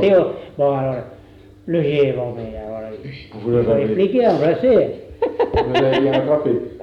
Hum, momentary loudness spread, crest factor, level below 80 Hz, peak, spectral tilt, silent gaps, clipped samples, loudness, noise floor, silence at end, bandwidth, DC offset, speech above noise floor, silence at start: none; 14 LU; 12 dB; -42 dBFS; -6 dBFS; -8.5 dB/octave; none; under 0.1%; -18 LUFS; -44 dBFS; 0 s; 6.8 kHz; under 0.1%; 26 dB; 0 s